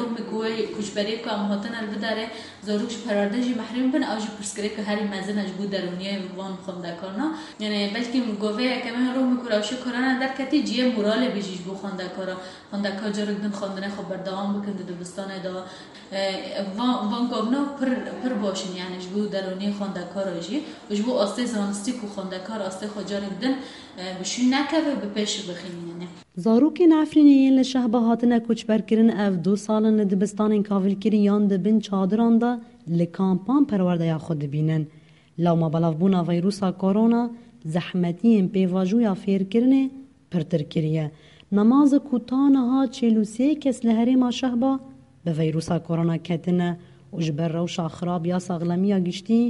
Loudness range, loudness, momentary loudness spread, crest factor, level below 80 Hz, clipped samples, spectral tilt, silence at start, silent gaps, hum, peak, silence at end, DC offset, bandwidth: 8 LU; -24 LUFS; 12 LU; 16 dB; -64 dBFS; under 0.1%; -6.5 dB/octave; 0 s; none; none; -6 dBFS; 0 s; under 0.1%; 11.5 kHz